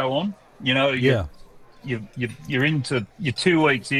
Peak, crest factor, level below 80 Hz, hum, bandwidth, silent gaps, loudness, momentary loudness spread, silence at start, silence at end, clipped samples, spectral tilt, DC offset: -6 dBFS; 16 dB; -48 dBFS; none; 13.5 kHz; none; -23 LUFS; 12 LU; 0 s; 0 s; under 0.1%; -5.5 dB/octave; under 0.1%